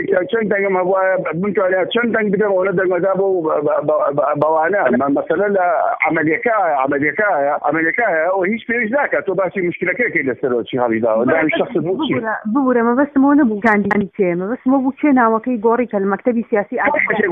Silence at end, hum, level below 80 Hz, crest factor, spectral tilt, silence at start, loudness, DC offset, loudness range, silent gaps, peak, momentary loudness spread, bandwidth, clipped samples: 0 s; none; -58 dBFS; 14 dB; -9 dB/octave; 0 s; -16 LUFS; under 0.1%; 2 LU; none; 0 dBFS; 4 LU; 3.8 kHz; under 0.1%